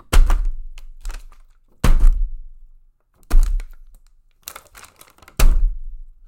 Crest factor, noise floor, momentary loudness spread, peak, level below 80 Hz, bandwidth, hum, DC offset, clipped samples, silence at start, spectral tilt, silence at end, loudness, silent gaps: 16 dB; -52 dBFS; 23 LU; -2 dBFS; -18 dBFS; 16.5 kHz; none; under 0.1%; under 0.1%; 0.1 s; -4.5 dB/octave; 0.25 s; -23 LUFS; none